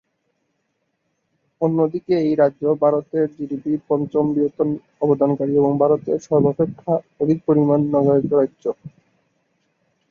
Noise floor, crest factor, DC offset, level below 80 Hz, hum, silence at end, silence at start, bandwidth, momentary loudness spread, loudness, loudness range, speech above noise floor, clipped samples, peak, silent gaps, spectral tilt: -72 dBFS; 16 dB; under 0.1%; -60 dBFS; none; 1.25 s; 1.6 s; 7 kHz; 7 LU; -19 LUFS; 3 LU; 53 dB; under 0.1%; -4 dBFS; none; -9.5 dB/octave